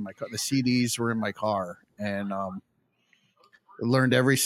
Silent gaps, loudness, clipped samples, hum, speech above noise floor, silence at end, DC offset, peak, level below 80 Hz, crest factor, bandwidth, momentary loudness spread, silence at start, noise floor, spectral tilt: none; -27 LUFS; under 0.1%; none; 42 dB; 0 s; under 0.1%; -8 dBFS; -70 dBFS; 20 dB; 16.5 kHz; 14 LU; 0 s; -68 dBFS; -4.5 dB/octave